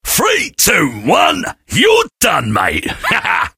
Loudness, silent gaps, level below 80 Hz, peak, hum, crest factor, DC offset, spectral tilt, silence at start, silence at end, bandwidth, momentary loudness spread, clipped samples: -12 LUFS; none; -38 dBFS; 0 dBFS; none; 14 dB; under 0.1%; -2.5 dB/octave; 0.05 s; 0.1 s; 17 kHz; 5 LU; under 0.1%